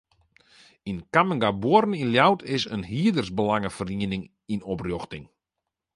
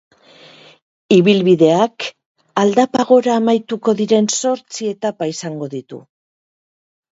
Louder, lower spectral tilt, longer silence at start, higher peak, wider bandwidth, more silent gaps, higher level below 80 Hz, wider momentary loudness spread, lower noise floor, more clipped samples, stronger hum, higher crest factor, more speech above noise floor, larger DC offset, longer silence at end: second, -24 LUFS vs -15 LUFS; about the same, -6 dB/octave vs -5 dB/octave; second, 0.85 s vs 1.1 s; second, -4 dBFS vs 0 dBFS; first, 11.5 kHz vs 8 kHz; second, none vs 2.26-2.35 s; first, -54 dBFS vs -64 dBFS; about the same, 14 LU vs 15 LU; first, -85 dBFS vs -45 dBFS; neither; neither; first, 22 dB vs 16 dB; first, 61 dB vs 30 dB; neither; second, 0.7 s vs 1.15 s